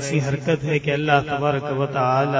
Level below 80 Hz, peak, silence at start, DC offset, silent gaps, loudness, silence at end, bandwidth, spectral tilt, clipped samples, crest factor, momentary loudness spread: -52 dBFS; -2 dBFS; 0 s; under 0.1%; none; -21 LUFS; 0 s; 8 kHz; -6 dB/octave; under 0.1%; 18 dB; 4 LU